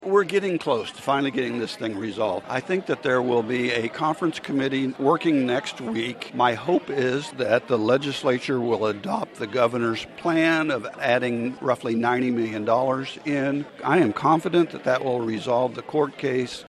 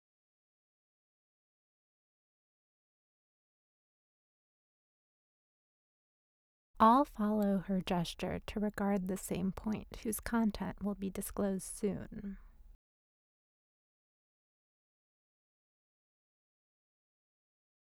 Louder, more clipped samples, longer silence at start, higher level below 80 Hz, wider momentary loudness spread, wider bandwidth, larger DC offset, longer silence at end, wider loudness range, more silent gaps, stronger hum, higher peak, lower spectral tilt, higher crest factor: first, -24 LUFS vs -35 LUFS; neither; second, 0 s vs 6.75 s; second, -66 dBFS vs -60 dBFS; second, 7 LU vs 12 LU; second, 12.5 kHz vs 17 kHz; neither; second, 0.05 s vs 5.3 s; second, 2 LU vs 10 LU; neither; neither; first, -6 dBFS vs -14 dBFS; about the same, -6 dB/octave vs -6 dB/octave; second, 18 dB vs 26 dB